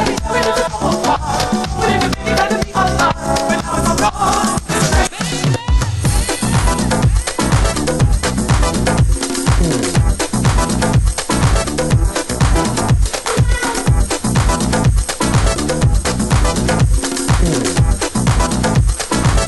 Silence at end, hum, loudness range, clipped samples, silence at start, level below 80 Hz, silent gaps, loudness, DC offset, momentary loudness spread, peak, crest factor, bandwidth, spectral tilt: 0 s; none; 1 LU; under 0.1%; 0 s; -20 dBFS; none; -15 LUFS; under 0.1%; 2 LU; -2 dBFS; 12 dB; 12.5 kHz; -4.5 dB/octave